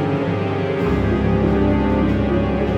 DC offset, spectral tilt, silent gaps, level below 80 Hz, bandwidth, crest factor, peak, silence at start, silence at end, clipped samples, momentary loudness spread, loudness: under 0.1%; -9 dB/octave; none; -28 dBFS; 8 kHz; 12 dB; -6 dBFS; 0 s; 0 s; under 0.1%; 4 LU; -19 LUFS